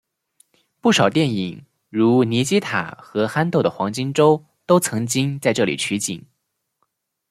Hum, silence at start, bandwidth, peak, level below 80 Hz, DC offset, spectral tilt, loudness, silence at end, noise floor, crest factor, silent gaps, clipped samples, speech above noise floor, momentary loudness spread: none; 0.85 s; 15.5 kHz; -2 dBFS; -62 dBFS; under 0.1%; -5 dB/octave; -20 LUFS; 1.1 s; -75 dBFS; 18 dB; none; under 0.1%; 56 dB; 9 LU